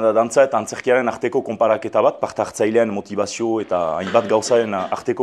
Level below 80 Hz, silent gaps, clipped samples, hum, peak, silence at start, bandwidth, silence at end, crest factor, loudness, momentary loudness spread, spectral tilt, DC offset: -62 dBFS; none; under 0.1%; none; 0 dBFS; 0 s; 12.5 kHz; 0 s; 18 dB; -19 LUFS; 7 LU; -4.5 dB/octave; under 0.1%